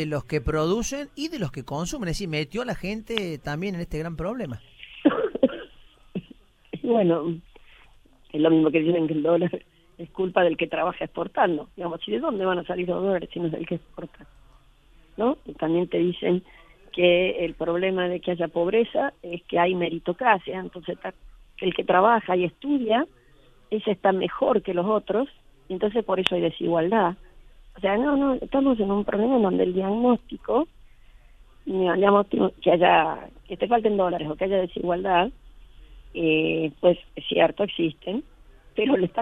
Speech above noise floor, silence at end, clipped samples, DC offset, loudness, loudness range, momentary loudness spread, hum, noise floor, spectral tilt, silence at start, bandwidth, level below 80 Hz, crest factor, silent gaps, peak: 31 dB; 0 s; under 0.1%; under 0.1%; -24 LUFS; 6 LU; 13 LU; none; -55 dBFS; -6 dB/octave; 0 s; 12.5 kHz; -48 dBFS; 24 dB; none; 0 dBFS